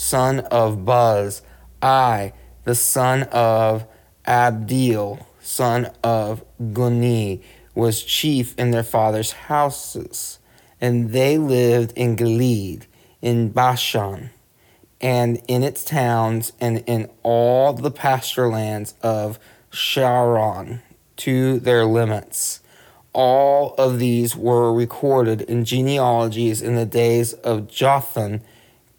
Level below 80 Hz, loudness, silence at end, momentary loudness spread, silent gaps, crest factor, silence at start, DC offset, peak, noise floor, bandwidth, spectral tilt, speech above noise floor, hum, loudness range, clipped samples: -54 dBFS; -19 LUFS; 0.55 s; 12 LU; none; 14 dB; 0 s; under 0.1%; -4 dBFS; -55 dBFS; 20 kHz; -5 dB/octave; 36 dB; none; 3 LU; under 0.1%